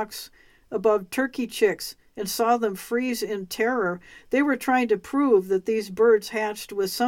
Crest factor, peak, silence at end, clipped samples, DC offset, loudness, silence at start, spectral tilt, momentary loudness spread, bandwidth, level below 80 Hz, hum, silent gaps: 16 dB; -8 dBFS; 0 s; under 0.1%; under 0.1%; -24 LUFS; 0 s; -4 dB/octave; 13 LU; 17 kHz; -62 dBFS; none; none